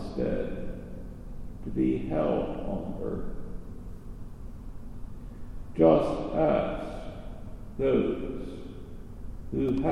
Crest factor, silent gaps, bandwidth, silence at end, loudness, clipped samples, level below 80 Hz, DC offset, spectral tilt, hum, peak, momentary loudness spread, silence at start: 22 dB; none; 10.5 kHz; 0 s; -29 LUFS; under 0.1%; -40 dBFS; under 0.1%; -8.5 dB/octave; none; -8 dBFS; 20 LU; 0 s